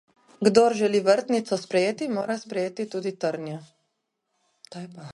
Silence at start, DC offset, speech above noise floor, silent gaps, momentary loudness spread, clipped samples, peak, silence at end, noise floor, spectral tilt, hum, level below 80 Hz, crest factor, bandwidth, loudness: 0.4 s; under 0.1%; 54 dB; none; 20 LU; under 0.1%; -2 dBFS; 0 s; -78 dBFS; -5 dB/octave; none; -72 dBFS; 22 dB; 11.5 kHz; -24 LUFS